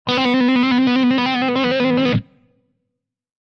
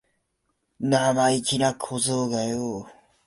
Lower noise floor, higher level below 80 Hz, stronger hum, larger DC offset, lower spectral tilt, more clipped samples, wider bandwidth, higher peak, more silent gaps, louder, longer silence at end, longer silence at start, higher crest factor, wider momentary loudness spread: about the same, -78 dBFS vs -75 dBFS; first, -54 dBFS vs -60 dBFS; neither; neither; first, -6.5 dB/octave vs -4 dB/octave; neither; second, 6.4 kHz vs 11.5 kHz; about the same, -8 dBFS vs -6 dBFS; neither; first, -16 LUFS vs -24 LUFS; first, 1.2 s vs 0.35 s; second, 0.05 s vs 0.8 s; second, 10 dB vs 20 dB; second, 3 LU vs 10 LU